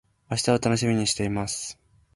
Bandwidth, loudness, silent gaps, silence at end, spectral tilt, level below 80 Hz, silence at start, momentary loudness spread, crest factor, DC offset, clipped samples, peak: 11.5 kHz; -25 LUFS; none; 0.4 s; -4.5 dB/octave; -52 dBFS; 0.3 s; 9 LU; 20 dB; under 0.1%; under 0.1%; -8 dBFS